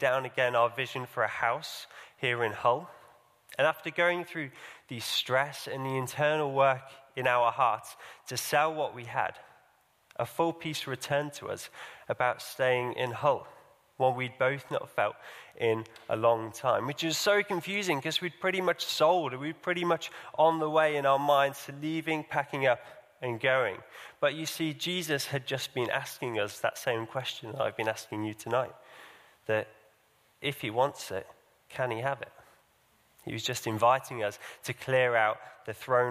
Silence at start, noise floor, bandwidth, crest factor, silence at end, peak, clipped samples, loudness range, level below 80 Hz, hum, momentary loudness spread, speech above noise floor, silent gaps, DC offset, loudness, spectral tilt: 0 s; -67 dBFS; 15.5 kHz; 20 dB; 0 s; -12 dBFS; under 0.1%; 6 LU; -74 dBFS; none; 14 LU; 37 dB; none; under 0.1%; -30 LUFS; -4 dB/octave